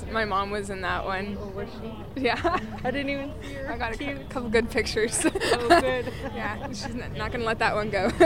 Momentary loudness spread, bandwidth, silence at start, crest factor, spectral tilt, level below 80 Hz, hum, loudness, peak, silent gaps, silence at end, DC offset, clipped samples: 11 LU; 16 kHz; 0 s; 22 dB; -4 dB/octave; -42 dBFS; none; -27 LUFS; -4 dBFS; none; 0 s; 0.5%; under 0.1%